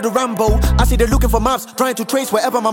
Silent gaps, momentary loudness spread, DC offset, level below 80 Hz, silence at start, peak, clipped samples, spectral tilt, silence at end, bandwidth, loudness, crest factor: none; 4 LU; under 0.1%; -20 dBFS; 0 s; 0 dBFS; under 0.1%; -5 dB/octave; 0 s; 17 kHz; -16 LUFS; 14 dB